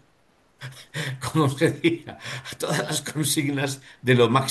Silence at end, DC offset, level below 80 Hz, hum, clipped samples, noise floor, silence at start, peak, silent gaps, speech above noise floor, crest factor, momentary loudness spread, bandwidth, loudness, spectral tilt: 0 s; under 0.1%; -60 dBFS; none; under 0.1%; -62 dBFS; 0.6 s; -4 dBFS; none; 38 dB; 20 dB; 15 LU; 13 kHz; -24 LUFS; -4.5 dB/octave